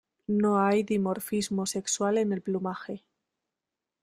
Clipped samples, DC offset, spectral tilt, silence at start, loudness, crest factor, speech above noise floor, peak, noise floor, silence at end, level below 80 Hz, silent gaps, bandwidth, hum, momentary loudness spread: under 0.1%; under 0.1%; -5 dB/octave; 0.3 s; -28 LUFS; 16 dB; 61 dB; -12 dBFS; -88 dBFS; 1.05 s; -68 dBFS; none; 16 kHz; none; 11 LU